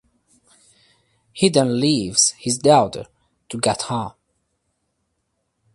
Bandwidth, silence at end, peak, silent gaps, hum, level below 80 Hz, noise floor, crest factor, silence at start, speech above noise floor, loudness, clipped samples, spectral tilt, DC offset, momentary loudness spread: 11.5 kHz; 1.65 s; 0 dBFS; none; none; -56 dBFS; -73 dBFS; 22 dB; 1.35 s; 54 dB; -18 LUFS; under 0.1%; -4 dB/octave; under 0.1%; 19 LU